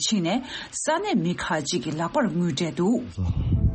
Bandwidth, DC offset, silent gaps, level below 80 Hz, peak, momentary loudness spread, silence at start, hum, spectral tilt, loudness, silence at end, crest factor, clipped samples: 8.8 kHz; under 0.1%; none; -36 dBFS; -10 dBFS; 4 LU; 0 s; none; -5 dB/octave; -25 LUFS; 0 s; 14 dB; under 0.1%